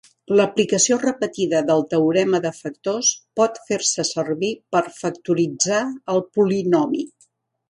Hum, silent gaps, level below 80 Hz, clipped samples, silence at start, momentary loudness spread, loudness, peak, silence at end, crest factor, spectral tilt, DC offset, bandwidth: none; none; -66 dBFS; under 0.1%; 0.3 s; 7 LU; -20 LUFS; -4 dBFS; 0.6 s; 18 dB; -3.5 dB/octave; under 0.1%; 11.5 kHz